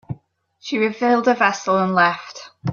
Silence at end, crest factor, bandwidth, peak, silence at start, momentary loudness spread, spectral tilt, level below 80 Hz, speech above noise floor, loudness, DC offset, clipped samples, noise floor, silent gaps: 0 s; 18 dB; 7.4 kHz; -2 dBFS; 0.1 s; 19 LU; -5.5 dB/octave; -62 dBFS; 37 dB; -18 LUFS; under 0.1%; under 0.1%; -55 dBFS; none